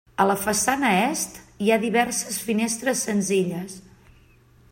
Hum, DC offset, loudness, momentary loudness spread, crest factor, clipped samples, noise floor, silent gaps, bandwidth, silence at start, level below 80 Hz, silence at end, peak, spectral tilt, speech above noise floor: none; under 0.1%; -23 LUFS; 9 LU; 18 dB; under 0.1%; -54 dBFS; none; 16.5 kHz; 0.2 s; -58 dBFS; 0.9 s; -6 dBFS; -3.5 dB/octave; 32 dB